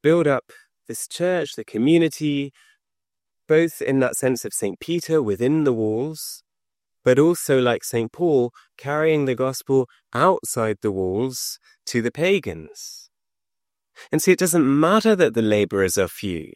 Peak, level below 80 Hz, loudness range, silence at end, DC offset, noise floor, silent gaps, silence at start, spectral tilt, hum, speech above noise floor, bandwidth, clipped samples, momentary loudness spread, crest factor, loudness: -4 dBFS; -62 dBFS; 4 LU; 0.1 s; under 0.1%; -89 dBFS; none; 0.05 s; -5 dB/octave; none; 68 dB; 16 kHz; under 0.1%; 13 LU; 18 dB; -21 LUFS